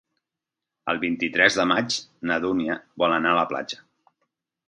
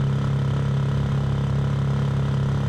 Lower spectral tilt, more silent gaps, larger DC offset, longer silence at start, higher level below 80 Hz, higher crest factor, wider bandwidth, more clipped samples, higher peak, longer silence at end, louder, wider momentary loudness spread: second, -3.5 dB/octave vs -8 dB/octave; neither; neither; first, 0.85 s vs 0 s; second, -62 dBFS vs -36 dBFS; first, 24 dB vs 8 dB; first, 11 kHz vs 8.4 kHz; neither; first, -2 dBFS vs -14 dBFS; first, 0.9 s vs 0 s; about the same, -23 LUFS vs -23 LUFS; first, 12 LU vs 0 LU